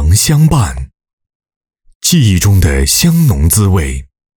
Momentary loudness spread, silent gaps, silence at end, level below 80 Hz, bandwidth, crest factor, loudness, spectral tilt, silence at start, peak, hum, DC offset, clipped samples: 12 LU; 1.13-1.18 s, 1.35-1.40 s, 1.56-1.61 s, 1.95-2.00 s; 0.35 s; -20 dBFS; over 20 kHz; 10 dB; -10 LUFS; -4.5 dB/octave; 0 s; 0 dBFS; none; under 0.1%; under 0.1%